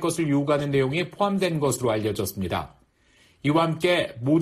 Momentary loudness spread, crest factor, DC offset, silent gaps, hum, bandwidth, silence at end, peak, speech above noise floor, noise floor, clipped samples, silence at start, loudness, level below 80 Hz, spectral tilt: 7 LU; 14 dB; under 0.1%; none; none; 14.5 kHz; 0 s; -10 dBFS; 36 dB; -60 dBFS; under 0.1%; 0 s; -24 LUFS; -54 dBFS; -5.5 dB/octave